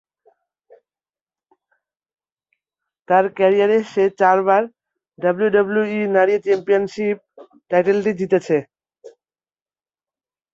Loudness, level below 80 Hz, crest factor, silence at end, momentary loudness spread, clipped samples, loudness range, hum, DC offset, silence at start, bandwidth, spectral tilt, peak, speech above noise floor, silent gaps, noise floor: -18 LUFS; -66 dBFS; 18 dB; 1.45 s; 7 LU; under 0.1%; 6 LU; none; under 0.1%; 3.1 s; 7.6 kHz; -7 dB/octave; -2 dBFS; over 73 dB; none; under -90 dBFS